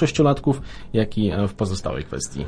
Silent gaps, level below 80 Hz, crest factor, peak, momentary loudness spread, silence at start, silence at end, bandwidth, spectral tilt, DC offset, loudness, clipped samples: none; -40 dBFS; 18 dB; -4 dBFS; 9 LU; 0 s; 0 s; 10.5 kHz; -6 dB/octave; under 0.1%; -23 LUFS; under 0.1%